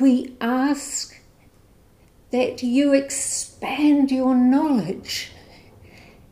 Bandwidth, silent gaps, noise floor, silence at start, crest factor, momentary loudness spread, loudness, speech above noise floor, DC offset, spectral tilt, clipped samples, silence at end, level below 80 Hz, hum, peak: 15.5 kHz; none; -54 dBFS; 0 s; 16 dB; 11 LU; -21 LUFS; 34 dB; under 0.1%; -3.5 dB/octave; under 0.1%; 1.05 s; -56 dBFS; none; -6 dBFS